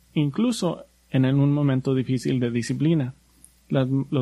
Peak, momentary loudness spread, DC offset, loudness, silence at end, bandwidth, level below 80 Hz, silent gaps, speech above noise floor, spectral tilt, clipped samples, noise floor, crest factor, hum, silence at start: -8 dBFS; 7 LU; under 0.1%; -23 LUFS; 0 s; 12 kHz; -58 dBFS; none; 33 dB; -7 dB/octave; under 0.1%; -55 dBFS; 14 dB; none; 0.15 s